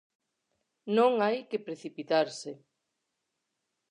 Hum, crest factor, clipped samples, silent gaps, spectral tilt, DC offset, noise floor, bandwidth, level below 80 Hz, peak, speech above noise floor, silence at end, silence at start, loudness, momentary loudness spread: none; 20 dB; under 0.1%; none; -5 dB/octave; under 0.1%; -83 dBFS; 10.5 kHz; -90 dBFS; -12 dBFS; 54 dB; 1.35 s; 0.85 s; -29 LUFS; 17 LU